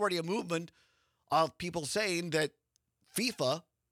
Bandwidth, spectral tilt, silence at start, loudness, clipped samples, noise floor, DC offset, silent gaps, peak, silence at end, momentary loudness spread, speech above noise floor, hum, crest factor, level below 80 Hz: 18.5 kHz; -3.5 dB/octave; 0 s; -33 LUFS; under 0.1%; -75 dBFS; under 0.1%; none; -14 dBFS; 0.3 s; 7 LU; 42 dB; none; 20 dB; -72 dBFS